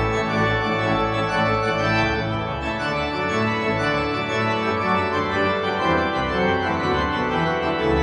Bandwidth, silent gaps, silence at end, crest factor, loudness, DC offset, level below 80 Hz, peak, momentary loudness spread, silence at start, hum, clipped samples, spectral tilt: 10.5 kHz; none; 0 s; 14 dB; -21 LUFS; under 0.1%; -40 dBFS; -8 dBFS; 3 LU; 0 s; none; under 0.1%; -6 dB/octave